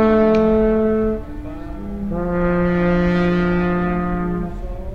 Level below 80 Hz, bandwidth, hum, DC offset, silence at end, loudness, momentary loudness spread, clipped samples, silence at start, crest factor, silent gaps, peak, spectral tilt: -30 dBFS; 6 kHz; none; 1%; 0 s; -18 LUFS; 16 LU; under 0.1%; 0 s; 14 dB; none; -4 dBFS; -9.5 dB/octave